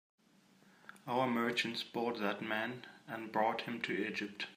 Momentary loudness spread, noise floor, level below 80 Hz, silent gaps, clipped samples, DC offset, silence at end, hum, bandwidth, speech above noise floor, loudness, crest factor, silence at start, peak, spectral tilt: 14 LU; -67 dBFS; -86 dBFS; none; under 0.1%; under 0.1%; 0 s; none; 15.5 kHz; 30 dB; -37 LUFS; 20 dB; 0.85 s; -18 dBFS; -4.5 dB/octave